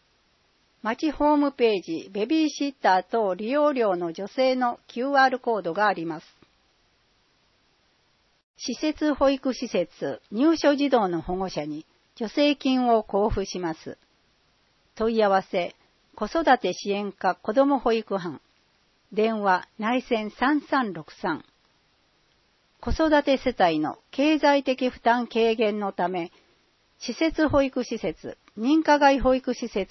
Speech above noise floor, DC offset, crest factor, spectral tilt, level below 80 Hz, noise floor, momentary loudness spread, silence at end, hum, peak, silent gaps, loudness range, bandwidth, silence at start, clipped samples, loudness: 42 dB; under 0.1%; 20 dB; -5 dB/octave; -48 dBFS; -66 dBFS; 12 LU; 0.05 s; none; -6 dBFS; 8.43-8.54 s; 5 LU; 6.2 kHz; 0.85 s; under 0.1%; -24 LUFS